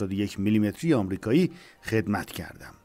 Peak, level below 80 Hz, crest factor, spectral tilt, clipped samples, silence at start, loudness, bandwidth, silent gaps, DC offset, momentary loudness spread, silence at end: -12 dBFS; -56 dBFS; 14 dB; -7 dB/octave; under 0.1%; 0 s; -26 LUFS; 16 kHz; none; under 0.1%; 13 LU; 0.15 s